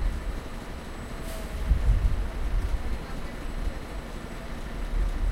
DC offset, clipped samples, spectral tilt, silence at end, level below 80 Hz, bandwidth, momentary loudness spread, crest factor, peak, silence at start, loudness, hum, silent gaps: under 0.1%; under 0.1%; -6 dB/octave; 0 s; -28 dBFS; 15 kHz; 11 LU; 18 dB; -10 dBFS; 0 s; -33 LUFS; none; none